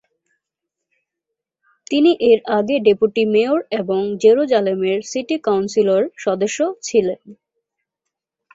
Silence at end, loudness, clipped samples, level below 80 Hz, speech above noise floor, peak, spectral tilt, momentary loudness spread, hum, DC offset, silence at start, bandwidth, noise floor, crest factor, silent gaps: 1.2 s; -17 LUFS; under 0.1%; -62 dBFS; 65 dB; -2 dBFS; -5 dB/octave; 7 LU; none; under 0.1%; 1.9 s; 8 kHz; -82 dBFS; 16 dB; none